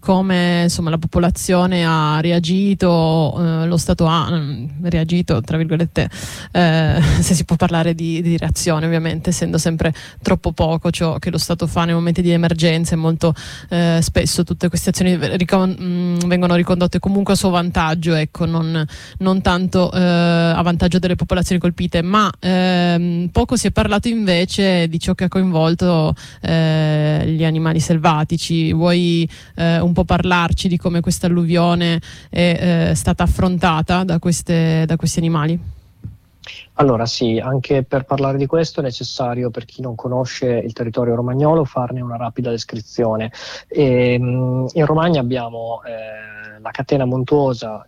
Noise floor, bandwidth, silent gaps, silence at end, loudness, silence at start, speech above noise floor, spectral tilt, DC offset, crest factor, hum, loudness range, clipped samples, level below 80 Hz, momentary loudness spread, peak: -37 dBFS; 15 kHz; none; 0.05 s; -17 LUFS; 0.05 s; 20 dB; -6 dB/octave; under 0.1%; 14 dB; none; 3 LU; under 0.1%; -34 dBFS; 8 LU; -4 dBFS